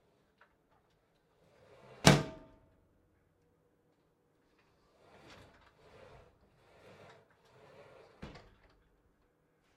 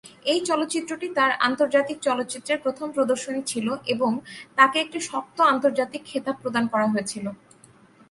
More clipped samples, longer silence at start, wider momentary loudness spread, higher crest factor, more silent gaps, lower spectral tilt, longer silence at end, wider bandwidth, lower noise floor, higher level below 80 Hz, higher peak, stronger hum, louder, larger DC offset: neither; first, 2.05 s vs 0.05 s; first, 31 LU vs 10 LU; first, 36 dB vs 22 dB; neither; about the same, -4.5 dB/octave vs -3.5 dB/octave; first, 1.5 s vs 0.75 s; first, 14 kHz vs 11.5 kHz; first, -74 dBFS vs -53 dBFS; first, -60 dBFS vs -70 dBFS; about the same, -4 dBFS vs -2 dBFS; neither; second, -28 LUFS vs -24 LUFS; neither